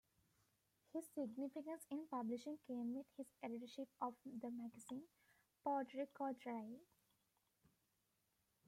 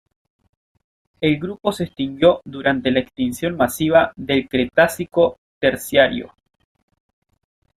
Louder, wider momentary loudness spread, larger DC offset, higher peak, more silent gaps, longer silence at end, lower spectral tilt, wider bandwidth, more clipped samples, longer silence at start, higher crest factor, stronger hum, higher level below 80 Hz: second, -50 LUFS vs -19 LUFS; about the same, 9 LU vs 7 LU; neither; second, -32 dBFS vs 0 dBFS; second, none vs 5.38-5.61 s; first, 1.85 s vs 1.5 s; about the same, -5.5 dB/octave vs -5 dB/octave; about the same, 16 kHz vs 15.5 kHz; neither; second, 0.95 s vs 1.2 s; about the same, 20 dB vs 20 dB; neither; second, under -90 dBFS vs -52 dBFS